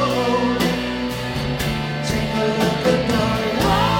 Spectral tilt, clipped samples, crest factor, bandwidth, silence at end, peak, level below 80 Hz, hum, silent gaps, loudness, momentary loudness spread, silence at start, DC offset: -5.5 dB/octave; under 0.1%; 14 dB; 17 kHz; 0 s; -4 dBFS; -36 dBFS; none; none; -20 LUFS; 6 LU; 0 s; under 0.1%